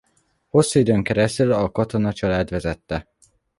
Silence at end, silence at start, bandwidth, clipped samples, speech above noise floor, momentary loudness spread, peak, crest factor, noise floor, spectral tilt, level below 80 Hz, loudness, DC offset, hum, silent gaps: 0.6 s; 0.55 s; 11.5 kHz; under 0.1%; 46 dB; 10 LU; -4 dBFS; 18 dB; -65 dBFS; -6 dB/octave; -42 dBFS; -21 LUFS; under 0.1%; none; none